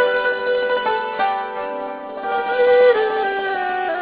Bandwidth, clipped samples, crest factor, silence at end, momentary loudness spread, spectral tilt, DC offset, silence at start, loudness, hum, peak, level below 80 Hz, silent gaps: 4 kHz; under 0.1%; 14 dB; 0 s; 13 LU; -6.5 dB/octave; under 0.1%; 0 s; -19 LUFS; none; -4 dBFS; -60 dBFS; none